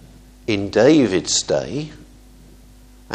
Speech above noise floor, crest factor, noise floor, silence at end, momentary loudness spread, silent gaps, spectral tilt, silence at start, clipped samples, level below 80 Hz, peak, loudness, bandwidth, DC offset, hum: 28 dB; 18 dB; -45 dBFS; 0 s; 16 LU; none; -4 dB/octave; 0.5 s; under 0.1%; -46 dBFS; -2 dBFS; -18 LUFS; 9.8 kHz; under 0.1%; none